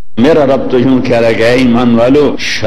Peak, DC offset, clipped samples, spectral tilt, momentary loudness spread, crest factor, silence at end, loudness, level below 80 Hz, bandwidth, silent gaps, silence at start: 0 dBFS; 10%; under 0.1%; -6 dB/octave; 2 LU; 10 dB; 0 s; -9 LUFS; -34 dBFS; 12 kHz; none; 0 s